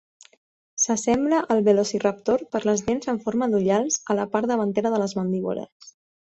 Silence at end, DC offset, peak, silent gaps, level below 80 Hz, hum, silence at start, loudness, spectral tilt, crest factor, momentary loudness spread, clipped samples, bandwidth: 0.4 s; under 0.1%; -6 dBFS; 5.72-5.80 s; -58 dBFS; none; 0.75 s; -23 LUFS; -4.5 dB/octave; 18 dB; 6 LU; under 0.1%; 8.2 kHz